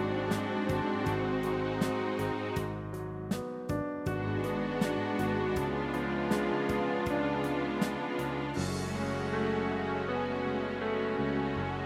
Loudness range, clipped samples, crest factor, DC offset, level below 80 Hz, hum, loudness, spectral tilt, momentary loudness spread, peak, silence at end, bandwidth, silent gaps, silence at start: 3 LU; under 0.1%; 16 dB; under 0.1%; -52 dBFS; none; -32 LUFS; -6.5 dB/octave; 4 LU; -16 dBFS; 0 s; 16 kHz; none; 0 s